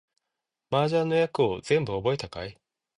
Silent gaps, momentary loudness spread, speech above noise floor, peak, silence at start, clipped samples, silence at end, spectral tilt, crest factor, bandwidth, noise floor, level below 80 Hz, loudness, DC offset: none; 13 LU; 60 dB; -10 dBFS; 0.7 s; under 0.1%; 0.45 s; -6 dB/octave; 18 dB; 11 kHz; -85 dBFS; -56 dBFS; -26 LUFS; under 0.1%